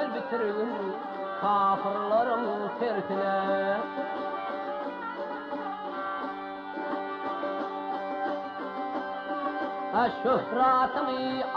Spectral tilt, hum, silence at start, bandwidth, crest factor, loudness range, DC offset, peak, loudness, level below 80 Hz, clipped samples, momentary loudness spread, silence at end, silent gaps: -7 dB/octave; none; 0 s; 6.4 kHz; 14 dB; 6 LU; under 0.1%; -16 dBFS; -30 LUFS; -70 dBFS; under 0.1%; 10 LU; 0 s; none